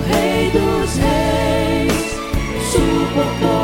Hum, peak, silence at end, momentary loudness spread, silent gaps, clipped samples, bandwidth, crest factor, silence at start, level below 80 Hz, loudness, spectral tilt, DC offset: none; -2 dBFS; 0 s; 5 LU; none; under 0.1%; 17 kHz; 14 dB; 0 s; -26 dBFS; -17 LUFS; -5 dB/octave; under 0.1%